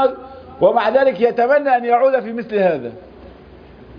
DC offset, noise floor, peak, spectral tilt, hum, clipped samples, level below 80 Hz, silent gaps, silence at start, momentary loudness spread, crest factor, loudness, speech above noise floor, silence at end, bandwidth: under 0.1%; -41 dBFS; -2 dBFS; -8 dB/octave; none; under 0.1%; -52 dBFS; none; 0 s; 12 LU; 16 dB; -16 LUFS; 25 dB; 0 s; 5.2 kHz